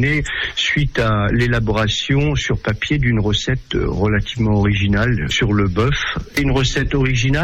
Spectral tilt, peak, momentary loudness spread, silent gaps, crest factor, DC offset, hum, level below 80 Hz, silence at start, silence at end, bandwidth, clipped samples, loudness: -5.5 dB/octave; -6 dBFS; 4 LU; none; 10 dB; under 0.1%; none; -28 dBFS; 0 s; 0 s; 14 kHz; under 0.1%; -17 LUFS